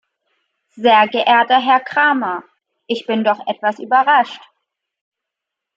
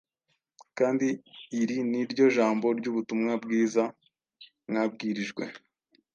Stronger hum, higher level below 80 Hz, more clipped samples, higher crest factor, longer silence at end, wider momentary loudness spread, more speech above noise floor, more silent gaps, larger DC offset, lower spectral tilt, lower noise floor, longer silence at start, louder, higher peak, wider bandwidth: neither; first, -74 dBFS vs -80 dBFS; neither; about the same, 16 dB vs 18 dB; first, 1.4 s vs 0.55 s; about the same, 12 LU vs 13 LU; first, 67 dB vs 51 dB; neither; neither; about the same, -5 dB/octave vs -5.5 dB/octave; first, -82 dBFS vs -78 dBFS; first, 0.75 s vs 0.6 s; first, -15 LUFS vs -28 LUFS; first, -2 dBFS vs -10 dBFS; about the same, 7.6 kHz vs 7.4 kHz